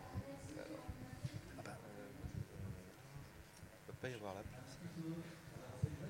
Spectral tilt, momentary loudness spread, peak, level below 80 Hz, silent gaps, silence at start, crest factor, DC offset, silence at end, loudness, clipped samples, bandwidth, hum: -6 dB/octave; 9 LU; -26 dBFS; -62 dBFS; none; 0 s; 24 dB; under 0.1%; 0 s; -51 LUFS; under 0.1%; 16 kHz; none